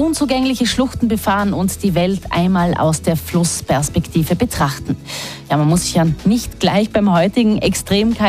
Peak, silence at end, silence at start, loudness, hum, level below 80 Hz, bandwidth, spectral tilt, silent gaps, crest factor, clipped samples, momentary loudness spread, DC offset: -4 dBFS; 0 s; 0 s; -16 LUFS; none; -34 dBFS; 15.5 kHz; -5 dB/octave; none; 12 dB; under 0.1%; 4 LU; 0.1%